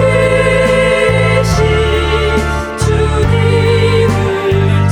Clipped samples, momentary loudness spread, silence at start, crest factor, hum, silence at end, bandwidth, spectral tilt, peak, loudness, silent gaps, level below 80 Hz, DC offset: under 0.1%; 3 LU; 0 s; 10 dB; none; 0 s; 13 kHz; -6 dB/octave; 0 dBFS; -11 LUFS; none; -22 dBFS; under 0.1%